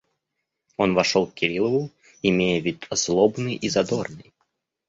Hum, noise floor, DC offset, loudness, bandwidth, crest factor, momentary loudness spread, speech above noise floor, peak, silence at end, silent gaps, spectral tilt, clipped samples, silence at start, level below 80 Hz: none; -81 dBFS; under 0.1%; -23 LUFS; 8 kHz; 20 dB; 8 LU; 58 dB; -4 dBFS; 0.65 s; none; -4.5 dB/octave; under 0.1%; 0.8 s; -56 dBFS